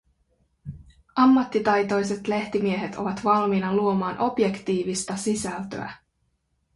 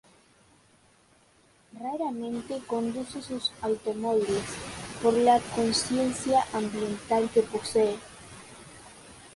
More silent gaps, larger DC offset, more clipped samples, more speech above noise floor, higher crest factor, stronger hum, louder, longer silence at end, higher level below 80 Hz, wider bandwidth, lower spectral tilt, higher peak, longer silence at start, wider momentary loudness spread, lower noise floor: neither; neither; neither; first, 48 dB vs 34 dB; about the same, 18 dB vs 20 dB; neither; first, -24 LUFS vs -28 LUFS; first, 0.8 s vs 0 s; about the same, -56 dBFS vs -58 dBFS; about the same, 11.5 kHz vs 11.5 kHz; first, -5.5 dB/octave vs -4 dB/octave; about the same, -8 dBFS vs -10 dBFS; second, 0.65 s vs 1.75 s; second, 14 LU vs 22 LU; first, -72 dBFS vs -62 dBFS